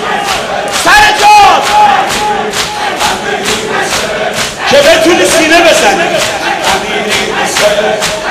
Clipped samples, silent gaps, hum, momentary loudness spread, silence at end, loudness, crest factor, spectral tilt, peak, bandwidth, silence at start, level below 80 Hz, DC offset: 0.9%; none; none; 9 LU; 0 s; -7 LUFS; 8 dB; -2 dB/octave; 0 dBFS; 16 kHz; 0 s; -34 dBFS; under 0.1%